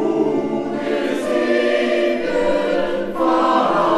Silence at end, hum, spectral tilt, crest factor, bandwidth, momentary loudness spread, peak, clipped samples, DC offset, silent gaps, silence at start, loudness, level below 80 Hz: 0 s; none; -5.5 dB/octave; 14 dB; 13 kHz; 6 LU; -4 dBFS; under 0.1%; under 0.1%; none; 0 s; -18 LUFS; -48 dBFS